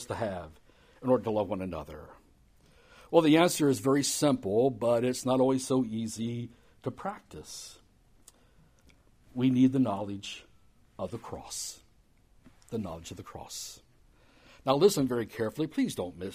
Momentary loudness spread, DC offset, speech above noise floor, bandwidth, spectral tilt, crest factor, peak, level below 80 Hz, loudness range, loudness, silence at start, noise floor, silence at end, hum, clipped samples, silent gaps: 19 LU; under 0.1%; 34 dB; 15.5 kHz; -5 dB/octave; 24 dB; -8 dBFS; -62 dBFS; 14 LU; -29 LUFS; 0 s; -63 dBFS; 0 s; none; under 0.1%; none